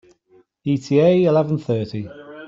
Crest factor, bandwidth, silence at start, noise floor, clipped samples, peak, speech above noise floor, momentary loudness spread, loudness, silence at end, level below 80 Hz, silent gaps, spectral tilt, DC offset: 16 dB; 7.8 kHz; 0.65 s; -56 dBFS; under 0.1%; -4 dBFS; 39 dB; 16 LU; -18 LUFS; 0 s; -60 dBFS; none; -8 dB/octave; under 0.1%